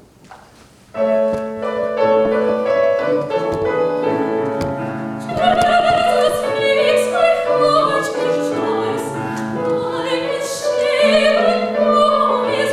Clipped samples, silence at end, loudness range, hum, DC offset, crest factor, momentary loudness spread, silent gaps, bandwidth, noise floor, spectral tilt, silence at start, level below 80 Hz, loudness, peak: under 0.1%; 0 s; 3 LU; none; under 0.1%; 14 dB; 9 LU; none; 14.5 kHz; -46 dBFS; -4.5 dB/octave; 0.3 s; -50 dBFS; -17 LUFS; -2 dBFS